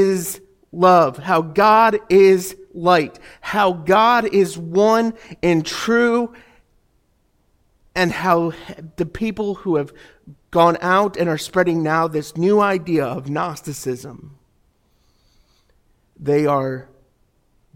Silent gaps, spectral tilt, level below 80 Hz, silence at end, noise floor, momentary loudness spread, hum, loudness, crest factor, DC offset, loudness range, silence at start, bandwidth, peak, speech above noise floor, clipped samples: none; -5.5 dB/octave; -52 dBFS; 0.95 s; -62 dBFS; 15 LU; none; -18 LUFS; 18 dB; under 0.1%; 10 LU; 0 s; 17 kHz; -2 dBFS; 45 dB; under 0.1%